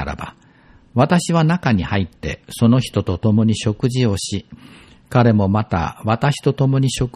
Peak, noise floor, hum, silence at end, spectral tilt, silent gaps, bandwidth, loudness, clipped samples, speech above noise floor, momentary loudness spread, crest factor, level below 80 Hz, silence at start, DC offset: -2 dBFS; -49 dBFS; none; 0.05 s; -6.5 dB/octave; none; 13.5 kHz; -18 LUFS; under 0.1%; 32 dB; 11 LU; 16 dB; -40 dBFS; 0 s; under 0.1%